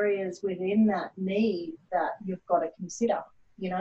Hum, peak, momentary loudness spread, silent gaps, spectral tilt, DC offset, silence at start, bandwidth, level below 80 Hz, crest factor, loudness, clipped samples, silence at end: none; -14 dBFS; 10 LU; none; -6.5 dB/octave; under 0.1%; 0 s; 8 kHz; -68 dBFS; 14 dB; -29 LUFS; under 0.1%; 0 s